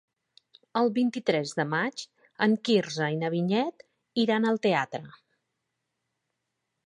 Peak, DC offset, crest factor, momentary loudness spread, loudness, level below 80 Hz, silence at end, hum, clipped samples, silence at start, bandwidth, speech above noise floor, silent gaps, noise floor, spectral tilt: -8 dBFS; under 0.1%; 20 dB; 9 LU; -27 LUFS; -78 dBFS; 1.75 s; none; under 0.1%; 0.75 s; 10.5 kHz; 55 dB; none; -82 dBFS; -5.5 dB/octave